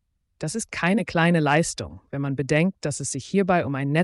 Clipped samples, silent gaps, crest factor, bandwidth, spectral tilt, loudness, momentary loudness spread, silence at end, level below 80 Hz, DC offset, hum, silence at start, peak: under 0.1%; none; 14 dB; 11.5 kHz; -5.5 dB/octave; -23 LUFS; 11 LU; 0 s; -54 dBFS; under 0.1%; none; 0.4 s; -8 dBFS